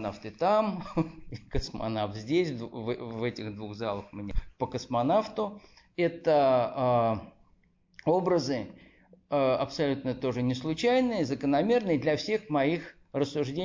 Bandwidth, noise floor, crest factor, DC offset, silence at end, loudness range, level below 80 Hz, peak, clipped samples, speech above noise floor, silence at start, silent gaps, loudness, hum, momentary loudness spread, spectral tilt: 7.8 kHz; -65 dBFS; 14 dB; under 0.1%; 0 s; 5 LU; -48 dBFS; -14 dBFS; under 0.1%; 37 dB; 0 s; none; -29 LUFS; none; 11 LU; -6.5 dB/octave